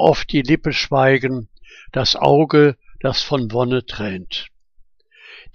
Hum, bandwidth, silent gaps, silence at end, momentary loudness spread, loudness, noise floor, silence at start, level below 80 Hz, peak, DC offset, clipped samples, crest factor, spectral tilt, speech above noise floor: none; 7 kHz; none; 0.05 s; 13 LU; -18 LUFS; -50 dBFS; 0 s; -40 dBFS; 0 dBFS; under 0.1%; under 0.1%; 18 dB; -6 dB/octave; 33 dB